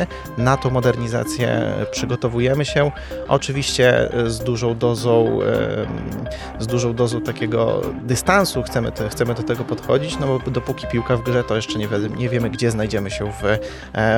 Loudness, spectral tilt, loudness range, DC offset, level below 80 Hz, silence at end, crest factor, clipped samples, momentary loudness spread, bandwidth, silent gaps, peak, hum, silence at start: -20 LUFS; -5.5 dB/octave; 3 LU; under 0.1%; -38 dBFS; 0 s; 18 dB; under 0.1%; 7 LU; 19 kHz; none; -2 dBFS; none; 0 s